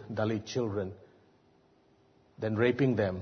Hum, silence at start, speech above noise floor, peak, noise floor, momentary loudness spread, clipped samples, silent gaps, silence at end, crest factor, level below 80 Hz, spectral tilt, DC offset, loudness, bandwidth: none; 0 s; 35 dB; -14 dBFS; -65 dBFS; 11 LU; under 0.1%; none; 0 s; 18 dB; -66 dBFS; -7 dB/octave; under 0.1%; -31 LUFS; 6.6 kHz